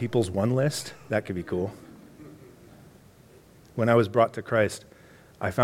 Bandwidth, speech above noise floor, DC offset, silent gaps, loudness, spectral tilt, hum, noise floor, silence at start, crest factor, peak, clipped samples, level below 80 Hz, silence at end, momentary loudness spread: 16.5 kHz; 28 dB; under 0.1%; none; -26 LUFS; -6 dB/octave; none; -54 dBFS; 0 s; 22 dB; -6 dBFS; under 0.1%; -60 dBFS; 0 s; 25 LU